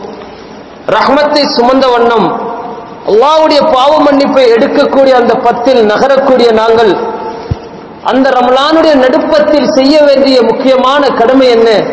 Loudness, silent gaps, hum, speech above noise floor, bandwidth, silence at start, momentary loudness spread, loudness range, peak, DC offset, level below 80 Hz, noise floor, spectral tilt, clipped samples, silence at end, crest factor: -7 LUFS; none; none; 22 dB; 8 kHz; 0 s; 13 LU; 2 LU; 0 dBFS; under 0.1%; -38 dBFS; -28 dBFS; -5 dB/octave; 5%; 0 s; 6 dB